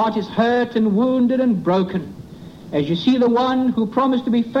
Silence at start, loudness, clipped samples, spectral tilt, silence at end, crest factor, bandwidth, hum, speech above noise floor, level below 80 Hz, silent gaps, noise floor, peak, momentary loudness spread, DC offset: 0 s; -18 LUFS; under 0.1%; -7.5 dB/octave; 0 s; 12 dB; 6.8 kHz; none; 20 dB; -54 dBFS; none; -38 dBFS; -6 dBFS; 11 LU; under 0.1%